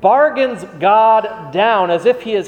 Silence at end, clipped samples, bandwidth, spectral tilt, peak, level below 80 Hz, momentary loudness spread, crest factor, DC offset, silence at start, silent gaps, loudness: 0 s; under 0.1%; 9.6 kHz; -5.5 dB/octave; 0 dBFS; -58 dBFS; 8 LU; 12 dB; under 0.1%; 0 s; none; -14 LUFS